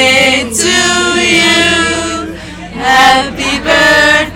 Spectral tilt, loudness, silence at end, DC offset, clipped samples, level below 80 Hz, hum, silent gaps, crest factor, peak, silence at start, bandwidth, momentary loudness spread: -2 dB/octave; -8 LUFS; 0 s; under 0.1%; 0.8%; -34 dBFS; none; none; 10 dB; 0 dBFS; 0 s; 20 kHz; 12 LU